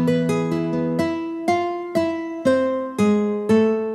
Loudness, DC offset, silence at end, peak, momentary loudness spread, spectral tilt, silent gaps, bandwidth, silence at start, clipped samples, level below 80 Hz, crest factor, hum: -21 LUFS; under 0.1%; 0 s; -6 dBFS; 5 LU; -7 dB/octave; none; 13.5 kHz; 0 s; under 0.1%; -60 dBFS; 14 dB; none